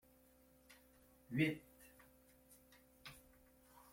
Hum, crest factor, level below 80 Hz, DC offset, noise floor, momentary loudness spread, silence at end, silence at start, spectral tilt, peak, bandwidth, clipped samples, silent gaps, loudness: none; 24 dB; -76 dBFS; under 0.1%; -70 dBFS; 29 LU; 0.75 s; 0.7 s; -6 dB/octave; -24 dBFS; 16.5 kHz; under 0.1%; none; -43 LUFS